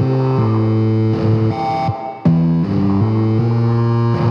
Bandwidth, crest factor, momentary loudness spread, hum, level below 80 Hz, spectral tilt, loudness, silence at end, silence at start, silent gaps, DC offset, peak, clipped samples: 5.8 kHz; 12 dB; 3 LU; none; -44 dBFS; -10 dB/octave; -16 LUFS; 0 s; 0 s; none; under 0.1%; -2 dBFS; under 0.1%